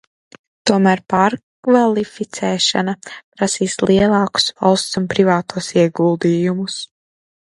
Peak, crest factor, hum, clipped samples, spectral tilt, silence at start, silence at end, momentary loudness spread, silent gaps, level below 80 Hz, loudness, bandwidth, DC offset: 0 dBFS; 16 dB; none; under 0.1%; -4.5 dB/octave; 0.65 s; 0.7 s; 10 LU; 1.43-1.63 s, 3.24-3.32 s; -50 dBFS; -16 LUFS; 11.5 kHz; under 0.1%